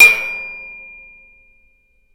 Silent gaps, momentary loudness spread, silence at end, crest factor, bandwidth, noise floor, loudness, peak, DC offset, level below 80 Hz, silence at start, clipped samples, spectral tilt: none; 24 LU; 1.4 s; 18 dB; 16.5 kHz; -56 dBFS; -14 LUFS; 0 dBFS; under 0.1%; -54 dBFS; 0 s; 0.1%; 1 dB/octave